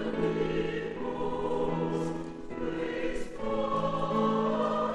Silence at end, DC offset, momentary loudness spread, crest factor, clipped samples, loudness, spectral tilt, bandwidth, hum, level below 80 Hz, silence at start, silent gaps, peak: 0 s; under 0.1%; 7 LU; 16 dB; under 0.1%; -31 LUFS; -7 dB/octave; 11 kHz; none; -48 dBFS; 0 s; none; -16 dBFS